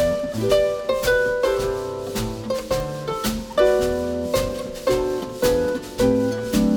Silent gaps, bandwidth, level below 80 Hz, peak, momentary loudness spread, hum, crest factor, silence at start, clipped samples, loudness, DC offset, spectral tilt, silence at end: none; over 20 kHz; -38 dBFS; -4 dBFS; 8 LU; none; 18 dB; 0 s; under 0.1%; -22 LUFS; under 0.1%; -5 dB/octave; 0 s